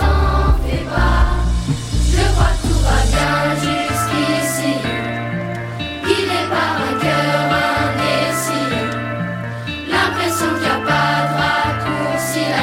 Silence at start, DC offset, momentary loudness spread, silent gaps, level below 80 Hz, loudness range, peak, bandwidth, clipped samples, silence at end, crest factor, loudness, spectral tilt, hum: 0 s; under 0.1%; 7 LU; none; -22 dBFS; 2 LU; -2 dBFS; 16.5 kHz; under 0.1%; 0 s; 16 dB; -17 LUFS; -4.5 dB/octave; none